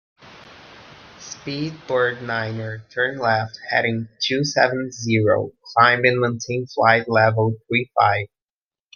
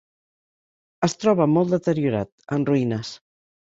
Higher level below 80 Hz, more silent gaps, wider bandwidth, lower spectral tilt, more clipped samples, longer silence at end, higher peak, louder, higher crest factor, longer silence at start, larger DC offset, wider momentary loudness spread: about the same, -62 dBFS vs -58 dBFS; second, none vs 2.32-2.38 s; second, 7.2 kHz vs 8 kHz; second, -5 dB/octave vs -6.5 dB/octave; neither; first, 0.7 s vs 0.5 s; first, 0 dBFS vs -4 dBFS; about the same, -20 LUFS vs -22 LUFS; about the same, 20 dB vs 18 dB; second, 0.25 s vs 1 s; neither; first, 12 LU vs 9 LU